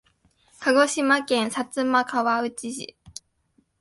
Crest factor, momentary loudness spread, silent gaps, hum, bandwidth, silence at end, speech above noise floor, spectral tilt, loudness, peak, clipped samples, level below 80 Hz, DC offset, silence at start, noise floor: 18 dB; 19 LU; none; none; 11.5 kHz; 0.7 s; 44 dB; -2.5 dB/octave; -23 LUFS; -6 dBFS; under 0.1%; -66 dBFS; under 0.1%; 0.6 s; -67 dBFS